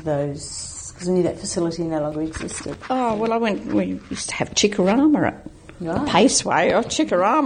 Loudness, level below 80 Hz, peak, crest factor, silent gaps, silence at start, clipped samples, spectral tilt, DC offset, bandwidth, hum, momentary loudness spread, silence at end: -21 LUFS; -48 dBFS; -2 dBFS; 20 dB; none; 0 s; under 0.1%; -4 dB/octave; under 0.1%; 9.8 kHz; none; 13 LU; 0 s